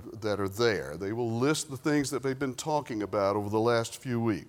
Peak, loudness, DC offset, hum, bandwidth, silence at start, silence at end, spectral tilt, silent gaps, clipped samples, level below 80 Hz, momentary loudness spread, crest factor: -12 dBFS; -30 LUFS; under 0.1%; none; 17.5 kHz; 0 s; 0.05 s; -5 dB/octave; none; under 0.1%; -62 dBFS; 5 LU; 18 dB